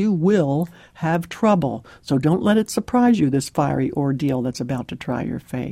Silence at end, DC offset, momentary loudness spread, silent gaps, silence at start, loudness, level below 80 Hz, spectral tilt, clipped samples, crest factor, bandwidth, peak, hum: 0 s; under 0.1%; 10 LU; none; 0 s; -21 LUFS; -50 dBFS; -7 dB/octave; under 0.1%; 14 dB; 16 kHz; -6 dBFS; none